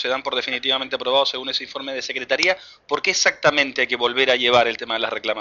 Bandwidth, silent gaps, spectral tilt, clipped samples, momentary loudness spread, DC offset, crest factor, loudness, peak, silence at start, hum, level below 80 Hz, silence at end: 7.6 kHz; none; -1.5 dB/octave; under 0.1%; 9 LU; under 0.1%; 18 dB; -20 LUFS; -4 dBFS; 0 s; none; -62 dBFS; 0 s